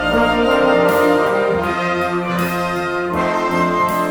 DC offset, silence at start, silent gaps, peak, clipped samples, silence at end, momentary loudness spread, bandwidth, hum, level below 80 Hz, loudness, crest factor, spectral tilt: under 0.1%; 0 s; none; -2 dBFS; under 0.1%; 0 s; 6 LU; over 20 kHz; none; -40 dBFS; -16 LUFS; 14 dB; -5.5 dB/octave